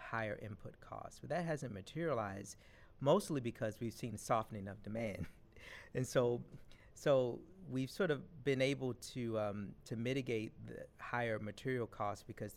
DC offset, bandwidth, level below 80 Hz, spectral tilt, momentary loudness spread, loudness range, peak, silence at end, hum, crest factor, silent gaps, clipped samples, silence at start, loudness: under 0.1%; 16 kHz; -66 dBFS; -6 dB/octave; 16 LU; 3 LU; -20 dBFS; 0 s; none; 20 dB; none; under 0.1%; 0 s; -40 LUFS